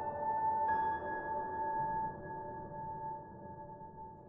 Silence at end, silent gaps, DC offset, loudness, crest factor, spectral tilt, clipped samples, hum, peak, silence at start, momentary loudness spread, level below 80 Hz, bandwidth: 0 s; none; under 0.1%; -38 LUFS; 14 dB; -6.5 dB/octave; under 0.1%; none; -24 dBFS; 0 s; 16 LU; -64 dBFS; 3.6 kHz